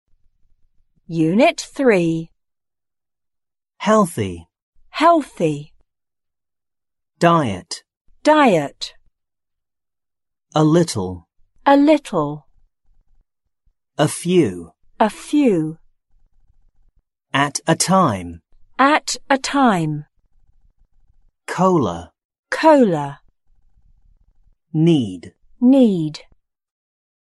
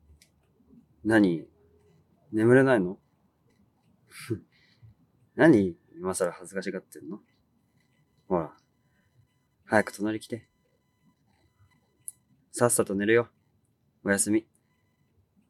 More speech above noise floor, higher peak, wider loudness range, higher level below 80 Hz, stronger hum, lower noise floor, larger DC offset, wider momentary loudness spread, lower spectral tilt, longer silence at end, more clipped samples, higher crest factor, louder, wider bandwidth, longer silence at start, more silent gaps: first, over 74 dB vs 46 dB; first, -2 dBFS vs -6 dBFS; second, 3 LU vs 7 LU; first, -54 dBFS vs -70 dBFS; neither; first, under -90 dBFS vs -71 dBFS; neither; second, 17 LU vs 22 LU; about the same, -5.5 dB/octave vs -5.5 dB/octave; about the same, 1.2 s vs 1.1 s; neither; about the same, 18 dB vs 22 dB; first, -17 LUFS vs -26 LUFS; second, 11.5 kHz vs 14 kHz; about the same, 1.1 s vs 1.05 s; first, 4.62-4.73 s, 7.97-8.05 s, 22.25-22.30 s, 22.39-22.43 s vs none